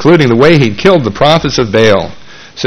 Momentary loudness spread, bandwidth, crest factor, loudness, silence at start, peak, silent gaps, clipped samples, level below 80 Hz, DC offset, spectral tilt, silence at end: 5 LU; 11 kHz; 8 dB; -8 LUFS; 0 s; 0 dBFS; none; 2%; -34 dBFS; under 0.1%; -6 dB/octave; 0 s